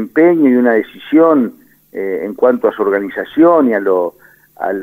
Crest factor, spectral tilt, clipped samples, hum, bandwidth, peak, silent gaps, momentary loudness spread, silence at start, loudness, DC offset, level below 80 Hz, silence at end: 12 dB; -8 dB/octave; under 0.1%; none; 15.5 kHz; 0 dBFS; none; 12 LU; 0 s; -13 LUFS; under 0.1%; -62 dBFS; 0 s